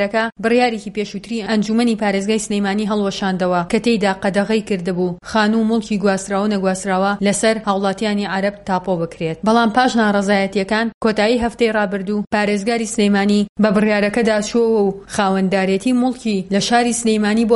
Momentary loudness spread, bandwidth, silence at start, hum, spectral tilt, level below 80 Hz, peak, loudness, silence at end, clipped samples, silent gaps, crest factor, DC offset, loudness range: 5 LU; 11.5 kHz; 0 s; none; -5 dB/octave; -48 dBFS; -2 dBFS; -17 LUFS; 0 s; under 0.1%; 10.94-11.01 s, 12.27-12.31 s, 13.49-13.56 s; 16 dB; under 0.1%; 2 LU